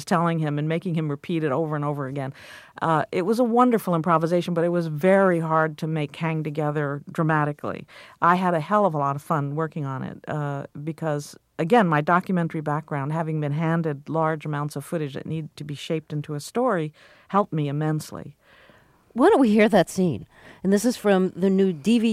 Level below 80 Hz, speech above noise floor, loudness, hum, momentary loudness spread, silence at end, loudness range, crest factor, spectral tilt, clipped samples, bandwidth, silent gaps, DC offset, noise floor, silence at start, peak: -64 dBFS; 32 dB; -23 LUFS; none; 12 LU; 0 s; 6 LU; 18 dB; -7 dB/octave; under 0.1%; 15.5 kHz; none; under 0.1%; -55 dBFS; 0 s; -6 dBFS